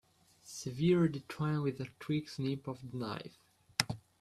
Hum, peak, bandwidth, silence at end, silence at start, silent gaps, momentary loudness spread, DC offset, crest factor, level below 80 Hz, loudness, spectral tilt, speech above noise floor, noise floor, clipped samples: none; -6 dBFS; 14 kHz; 0.2 s; 0.45 s; none; 13 LU; under 0.1%; 30 dB; -68 dBFS; -36 LUFS; -5.5 dB/octave; 25 dB; -60 dBFS; under 0.1%